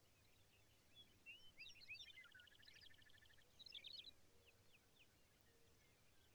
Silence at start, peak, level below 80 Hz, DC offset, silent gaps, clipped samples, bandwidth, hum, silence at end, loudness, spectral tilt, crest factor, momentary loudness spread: 0 s; -48 dBFS; -84 dBFS; under 0.1%; none; under 0.1%; over 20 kHz; none; 0 s; -61 LUFS; -1.5 dB/octave; 18 dB; 11 LU